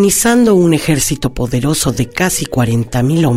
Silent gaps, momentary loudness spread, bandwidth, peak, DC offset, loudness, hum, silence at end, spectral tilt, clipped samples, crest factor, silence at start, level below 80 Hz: none; 6 LU; 16.5 kHz; 0 dBFS; under 0.1%; -13 LUFS; none; 0 s; -5 dB/octave; under 0.1%; 12 dB; 0 s; -32 dBFS